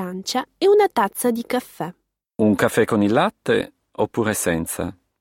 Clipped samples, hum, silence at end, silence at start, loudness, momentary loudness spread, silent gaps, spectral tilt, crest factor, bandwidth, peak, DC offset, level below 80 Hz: under 0.1%; none; 0.3 s; 0 s; -20 LUFS; 15 LU; none; -5 dB/octave; 18 dB; 17 kHz; -2 dBFS; under 0.1%; -54 dBFS